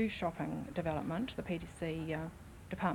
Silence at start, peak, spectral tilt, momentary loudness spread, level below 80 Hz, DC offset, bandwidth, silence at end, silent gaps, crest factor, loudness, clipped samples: 0 s; -18 dBFS; -7 dB/octave; 7 LU; -56 dBFS; under 0.1%; 18.5 kHz; 0 s; none; 20 dB; -40 LUFS; under 0.1%